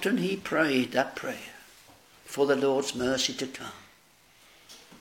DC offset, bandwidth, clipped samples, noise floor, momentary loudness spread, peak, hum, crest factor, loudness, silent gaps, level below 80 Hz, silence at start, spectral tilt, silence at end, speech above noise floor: under 0.1%; 17 kHz; under 0.1%; -60 dBFS; 24 LU; -10 dBFS; none; 20 dB; -28 LUFS; none; -64 dBFS; 0 s; -3.5 dB/octave; 0.05 s; 32 dB